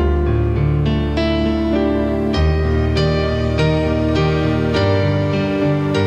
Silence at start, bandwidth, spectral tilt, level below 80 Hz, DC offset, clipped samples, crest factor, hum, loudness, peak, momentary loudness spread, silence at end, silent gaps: 0 s; 8.4 kHz; -8 dB/octave; -24 dBFS; under 0.1%; under 0.1%; 12 dB; none; -17 LUFS; -4 dBFS; 2 LU; 0 s; none